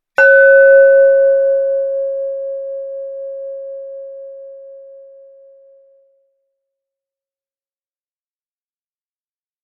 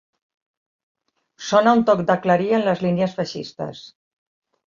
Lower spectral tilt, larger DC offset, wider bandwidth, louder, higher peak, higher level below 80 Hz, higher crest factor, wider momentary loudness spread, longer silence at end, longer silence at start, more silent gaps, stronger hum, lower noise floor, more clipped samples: second, -2 dB/octave vs -6 dB/octave; neither; second, 5.6 kHz vs 7.4 kHz; first, -11 LUFS vs -19 LUFS; about the same, 0 dBFS vs -2 dBFS; second, -76 dBFS vs -64 dBFS; about the same, 16 dB vs 20 dB; first, 24 LU vs 16 LU; first, 4.85 s vs 0.85 s; second, 0.2 s vs 1.4 s; neither; neither; first, under -90 dBFS vs -43 dBFS; neither